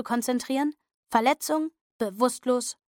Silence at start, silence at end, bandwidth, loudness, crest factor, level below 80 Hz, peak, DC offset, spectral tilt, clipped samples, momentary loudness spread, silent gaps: 0 s; 0.15 s; 17.5 kHz; -27 LUFS; 18 dB; -72 dBFS; -8 dBFS; under 0.1%; -3 dB/octave; under 0.1%; 9 LU; 0.96-1.03 s, 1.81-1.99 s